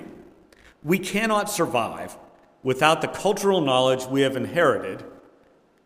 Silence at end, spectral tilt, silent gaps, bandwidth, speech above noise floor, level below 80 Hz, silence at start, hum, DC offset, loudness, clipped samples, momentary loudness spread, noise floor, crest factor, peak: 0.7 s; -4.5 dB/octave; none; 16 kHz; 36 dB; -60 dBFS; 0 s; none; under 0.1%; -22 LUFS; under 0.1%; 14 LU; -58 dBFS; 22 dB; -2 dBFS